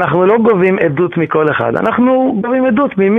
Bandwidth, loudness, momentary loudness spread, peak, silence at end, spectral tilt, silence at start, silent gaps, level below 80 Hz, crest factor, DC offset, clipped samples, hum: 3.9 kHz; -12 LUFS; 4 LU; 0 dBFS; 0 s; -9.5 dB/octave; 0 s; none; -48 dBFS; 12 dB; under 0.1%; under 0.1%; none